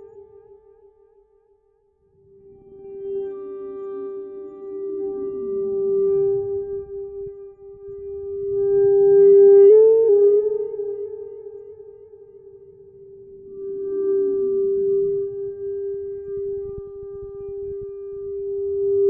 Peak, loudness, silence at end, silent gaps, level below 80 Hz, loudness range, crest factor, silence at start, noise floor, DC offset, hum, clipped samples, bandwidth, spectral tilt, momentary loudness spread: -6 dBFS; -19 LUFS; 0 s; none; -56 dBFS; 19 LU; 16 dB; 0 s; -63 dBFS; under 0.1%; none; under 0.1%; 2.1 kHz; -12.5 dB/octave; 22 LU